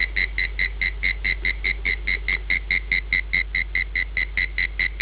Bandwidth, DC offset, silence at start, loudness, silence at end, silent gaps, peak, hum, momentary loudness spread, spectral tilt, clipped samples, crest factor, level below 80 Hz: 4 kHz; under 0.1%; 0 s; -22 LUFS; 0 s; none; -8 dBFS; none; 2 LU; -1 dB/octave; under 0.1%; 16 dB; -32 dBFS